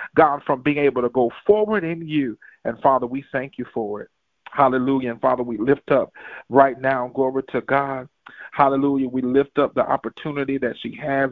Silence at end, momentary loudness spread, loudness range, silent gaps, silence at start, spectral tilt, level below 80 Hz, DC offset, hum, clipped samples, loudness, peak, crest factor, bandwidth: 0 s; 12 LU; 3 LU; none; 0 s; -9.5 dB/octave; -56 dBFS; under 0.1%; none; under 0.1%; -21 LUFS; 0 dBFS; 20 dB; 4.6 kHz